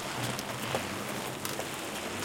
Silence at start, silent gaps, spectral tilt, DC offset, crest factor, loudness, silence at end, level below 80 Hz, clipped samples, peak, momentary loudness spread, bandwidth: 0 s; none; -3 dB/octave; under 0.1%; 20 dB; -35 LUFS; 0 s; -62 dBFS; under 0.1%; -14 dBFS; 2 LU; 17 kHz